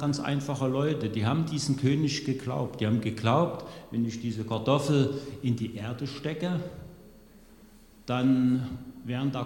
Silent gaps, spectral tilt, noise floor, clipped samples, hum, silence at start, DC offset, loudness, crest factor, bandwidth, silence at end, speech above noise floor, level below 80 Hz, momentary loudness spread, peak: none; -6.5 dB/octave; -54 dBFS; under 0.1%; none; 0 s; under 0.1%; -29 LUFS; 18 dB; 17 kHz; 0 s; 26 dB; -56 dBFS; 10 LU; -10 dBFS